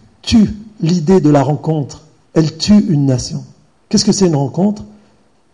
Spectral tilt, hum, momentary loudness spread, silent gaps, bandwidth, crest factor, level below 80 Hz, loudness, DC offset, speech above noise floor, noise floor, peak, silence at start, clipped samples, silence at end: -6 dB/octave; none; 10 LU; none; 11 kHz; 12 dB; -38 dBFS; -14 LUFS; under 0.1%; 41 dB; -53 dBFS; -2 dBFS; 0.25 s; under 0.1%; 0.65 s